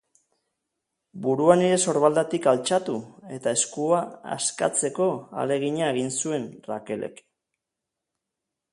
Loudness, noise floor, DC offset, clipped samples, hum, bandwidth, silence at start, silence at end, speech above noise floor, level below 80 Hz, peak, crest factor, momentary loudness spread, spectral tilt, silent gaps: -24 LUFS; -85 dBFS; under 0.1%; under 0.1%; none; 11.5 kHz; 1.15 s; 1.6 s; 61 dB; -70 dBFS; -2 dBFS; 22 dB; 14 LU; -4 dB/octave; none